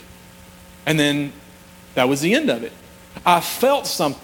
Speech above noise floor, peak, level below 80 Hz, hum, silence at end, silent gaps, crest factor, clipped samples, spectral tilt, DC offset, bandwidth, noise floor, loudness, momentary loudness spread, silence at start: 26 dB; -2 dBFS; -54 dBFS; none; 0.05 s; none; 20 dB; under 0.1%; -4 dB/octave; under 0.1%; 19.5 kHz; -44 dBFS; -20 LUFS; 11 LU; 0.85 s